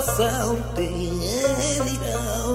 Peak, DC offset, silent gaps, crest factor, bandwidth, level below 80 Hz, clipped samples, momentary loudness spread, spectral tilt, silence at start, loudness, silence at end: -8 dBFS; under 0.1%; none; 16 dB; 16 kHz; -34 dBFS; under 0.1%; 4 LU; -4 dB/octave; 0 s; -24 LUFS; 0 s